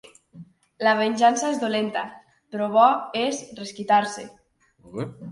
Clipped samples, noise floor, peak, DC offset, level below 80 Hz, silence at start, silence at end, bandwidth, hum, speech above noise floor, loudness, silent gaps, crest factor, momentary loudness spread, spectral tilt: under 0.1%; -47 dBFS; -4 dBFS; under 0.1%; -70 dBFS; 0.35 s; 0 s; 11.5 kHz; none; 25 dB; -22 LUFS; none; 20 dB; 18 LU; -4 dB/octave